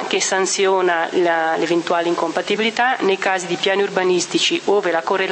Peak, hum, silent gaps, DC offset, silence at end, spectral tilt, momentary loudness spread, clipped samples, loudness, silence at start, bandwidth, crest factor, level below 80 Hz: -4 dBFS; none; none; under 0.1%; 0 s; -2.5 dB/octave; 3 LU; under 0.1%; -18 LUFS; 0 s; 8.8 kHz; 14 dB; -72 dBFS